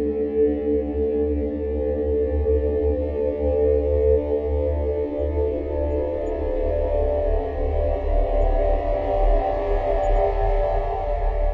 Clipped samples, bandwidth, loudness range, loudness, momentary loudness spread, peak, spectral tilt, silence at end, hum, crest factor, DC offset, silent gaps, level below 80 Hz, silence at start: under 0.1%; 4.4 kHz; 2 LU; -23 LUFS; 5 LU; -8 dBFS; -10 dB/octave; 0 s; none; 14 dB; under 0.1%; none; -26 dBFS; 0 s